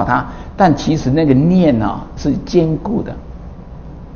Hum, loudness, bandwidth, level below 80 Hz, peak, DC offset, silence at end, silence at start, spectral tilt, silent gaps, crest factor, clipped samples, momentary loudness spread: none; -15 LUFS; 7 kHz; -32 dBFS; 0 dBFS; under 0.1%; 0 s; 0 s; -7.5 dB/octave; none; 16 dB; under 0.1%; 22 LU